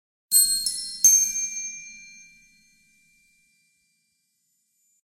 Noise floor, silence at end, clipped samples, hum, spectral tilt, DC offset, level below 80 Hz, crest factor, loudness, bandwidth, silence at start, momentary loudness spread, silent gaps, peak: -73 dBFS; 3 s; under 0.1%; none; 4.5 dB/octave; under 0.1%; -62 dBFS; 22 dB; -19 LUFS; 16 kHz; 0.3 s; 23 LU; none; -4 dBFS